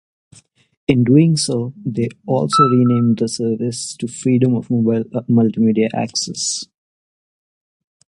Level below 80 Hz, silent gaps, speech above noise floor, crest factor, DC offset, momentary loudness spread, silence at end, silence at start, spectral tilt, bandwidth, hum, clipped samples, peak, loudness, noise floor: -54 dBFS; none; over 74 dB; 18 dB; under 0.1%; 10 LU; 1.45 s; 0.9 s; -6 dB/octave; 11.5 kHz; none; under 0.1%; 0 dBFS; -17 LUFS; under -90 dBFS